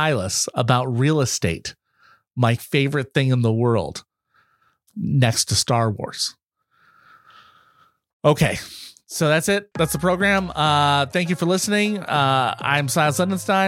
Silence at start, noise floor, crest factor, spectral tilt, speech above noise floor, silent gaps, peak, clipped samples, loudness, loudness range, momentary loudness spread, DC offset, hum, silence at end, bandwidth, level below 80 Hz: 0 s; -63 dBFS; 20 dB; -4.5 dB/octave; 44 dB; 8.13-8.20 s; -2 dBFS; under 0.1%; -20 LUFS; 5 LU; 9 LU; under 0.1%; none; 0 s; 16.5 kHz; -52 dBFS